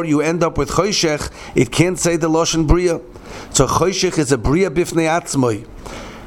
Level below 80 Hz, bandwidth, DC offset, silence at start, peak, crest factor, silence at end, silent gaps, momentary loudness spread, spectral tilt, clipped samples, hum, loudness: -30 dBFS; 17 kHz; under 0.1%; 0 s; 0 dBFS; 18 dB; 0 s; none; 11 LU; -4.5 dB/octave; under 0.1%; none; -17 LUFS